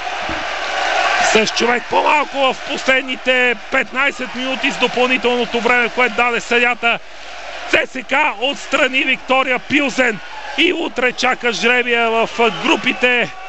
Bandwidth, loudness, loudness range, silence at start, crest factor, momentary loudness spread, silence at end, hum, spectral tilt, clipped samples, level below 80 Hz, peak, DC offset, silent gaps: 8.6 kHz; -15 LUFS; 1 LU; 0 s; 16 dB; 7 LU; 0 s; none; -2.5 dB/octave; under 0.1%; -48 dBFS; -2 dBFS; 2%; none